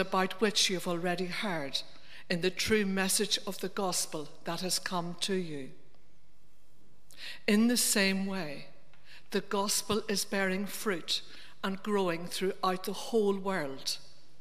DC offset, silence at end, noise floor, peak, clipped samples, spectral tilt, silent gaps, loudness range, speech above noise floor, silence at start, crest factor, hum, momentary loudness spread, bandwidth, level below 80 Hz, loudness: 0.9%; 0.35 s; -68 dBFS; -12 dBFS; under 0.1%; -3 dB/octave; none; 5 LU; 36 dB; 0 s; 20 dB; none; 12 LU; 15.5 kHz; -68 dBFS; -31 LUFS